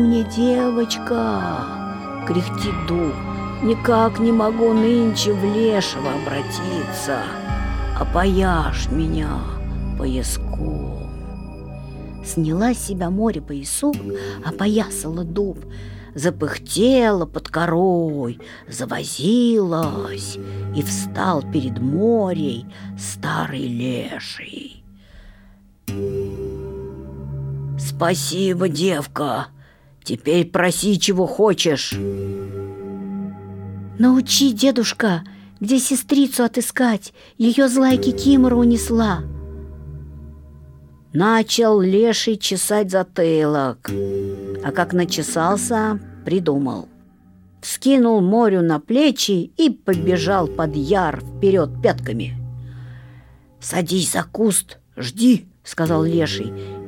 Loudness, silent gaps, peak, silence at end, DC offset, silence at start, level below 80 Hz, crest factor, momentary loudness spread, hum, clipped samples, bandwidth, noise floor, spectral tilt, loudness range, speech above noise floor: -19 LUFS; none; -2 dBFS; 0 s; under 0.1%; 0 s; -36 dBFS; 18 dB; 16 LU; none; under 0.1%; 18.5 kHz; -49 dBFS; -5 dB/octave; 7 LU; 30 dB